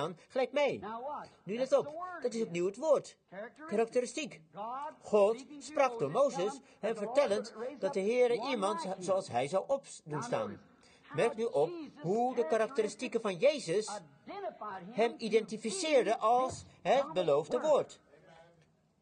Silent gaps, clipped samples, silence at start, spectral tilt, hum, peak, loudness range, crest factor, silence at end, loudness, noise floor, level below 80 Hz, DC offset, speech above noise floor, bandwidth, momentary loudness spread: none; under 0.1%; 0 s; -4.5 dB/octave; none; -16 dBFS; 3 LU; 18 dB; 1.05 s; -33 LUFS; -68 dBFS; -76 dBFS; under 0.1%; 35 dB; 9.8 kHz; 13 LU